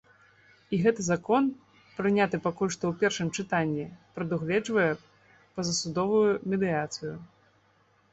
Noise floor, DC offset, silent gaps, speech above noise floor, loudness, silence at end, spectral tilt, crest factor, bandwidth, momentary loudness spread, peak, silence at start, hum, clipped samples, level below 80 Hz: -65 dBFS; under 0.1%; none; 38 dB; -28 LUFS; 0.85 s; -5 dB/octave; 18 dB; 8.2 kHz; 12 LU; -12 dBFS; 0.7 s; none; under 0.1%; -64 dBFS